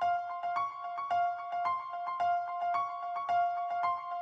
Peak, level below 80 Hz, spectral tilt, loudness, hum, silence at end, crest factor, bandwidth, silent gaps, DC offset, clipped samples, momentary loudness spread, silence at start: -20 dBFS; -84 dBFS; -3.5 dB/octave; -34 LUFS; none; 0 s; 14 dB; 6.8 kHz; none; under 0.1%; under 0.1%; 5 LU; 0 s